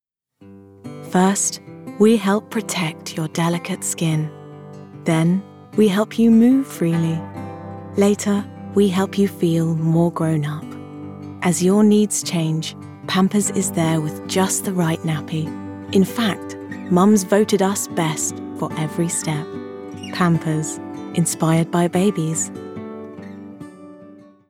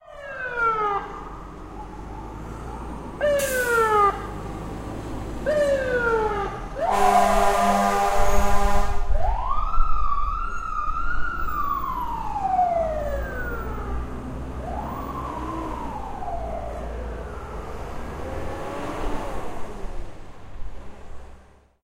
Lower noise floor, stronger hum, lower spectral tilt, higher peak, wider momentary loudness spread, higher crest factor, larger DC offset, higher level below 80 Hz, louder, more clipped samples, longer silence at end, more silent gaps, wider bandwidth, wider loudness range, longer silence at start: about the same, -49 dBFS vs -49 dBFS; neither; about the same, -5.5 dB/octave vs -5 dB/octave; about the same, -4 dBFS vs -6 dBFS; about the same, 18 LU vs 17 LU; about the same, 16 dB vs 18 dB; neither; second, -68 dBFS vs -30 dBFS; first, -19 LUFS vs -25 LUFS; neither; second, 0.25 s vs 0.45 s; neither; about the same, 16.5 kHz vs 16 kHz; second, 4 LU vs 12 LU; first, 0.4 s vs 0.05 s